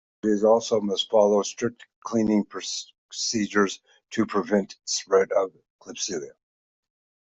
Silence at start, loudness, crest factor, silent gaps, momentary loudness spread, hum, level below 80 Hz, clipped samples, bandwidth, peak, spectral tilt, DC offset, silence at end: 0.25 s; -25 LUFS; 20 dB; 1.96-2.02 s, 2.98-3.09 s, 5.70-5.79 s; 13 LU; none; -66 dBFS; under 0.1%; 8.2 kHz; -6 dBFS; -4 dB/octave; under 0.1%; 1 s